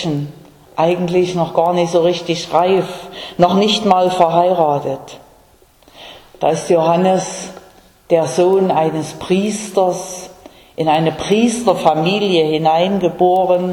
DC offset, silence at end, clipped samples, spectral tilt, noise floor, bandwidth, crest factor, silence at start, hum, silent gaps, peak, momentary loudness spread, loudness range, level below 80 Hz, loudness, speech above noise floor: under 0.1%; 0 s; under 0.1%; -5.5 dB/octave; -49 dBFS; 18 kHz; 16 dB; 0 s; none; none; 0 dBFS; 13 LU; 3 LU; -52 dBFS; -15 LUFS; 35 dB